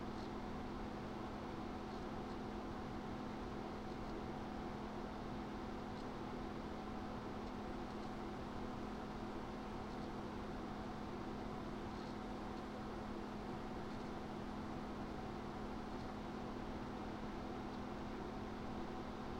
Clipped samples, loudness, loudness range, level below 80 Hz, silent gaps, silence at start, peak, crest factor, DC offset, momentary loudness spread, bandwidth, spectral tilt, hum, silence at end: under 0.1%; -48 LUFS; 0 LU; -56 dBFS; none; 0 s; -34 dBFS; 12 dB; under 0.1%; 1 LU; 16 kHz; -6.5 dB/octave; none; 0 s